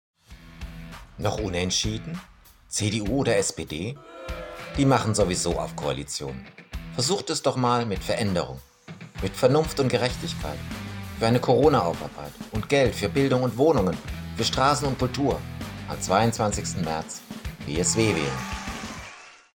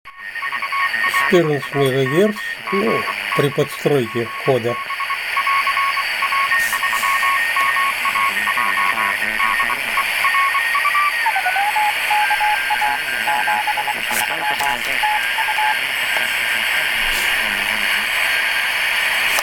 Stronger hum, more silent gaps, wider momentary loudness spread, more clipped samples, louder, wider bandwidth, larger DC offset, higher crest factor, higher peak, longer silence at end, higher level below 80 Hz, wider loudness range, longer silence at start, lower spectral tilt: neither; neither; first, 17 LU vs 4 LU; neither; second, -25 LUFS vs -17 LUFS; about the same, 17.5 kHz vs 17.5 kHz; neither; about the same, 20 dB vs 16 dB; second, -6 dBFS vs -2 dBFS; first, 0.25 s vs 0 s; first, -42 dBFS vs -48 dBFS; about the same, 4 LU vs 2 LU; first, 0.3 s vs 0.05 s; first, -4.5 dB/octave vs -3 dB/octave